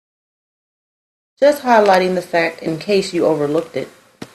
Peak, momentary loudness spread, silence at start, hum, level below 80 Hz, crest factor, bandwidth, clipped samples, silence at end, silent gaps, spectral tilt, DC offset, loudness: 0 dBFS; 13 LU; 1.4 s; none; -62 dBFS; 18 dB; 14 kHz; under 0.1%; 0.1 s; none; -5 dB/octave; under 0.1%; -16 LUFS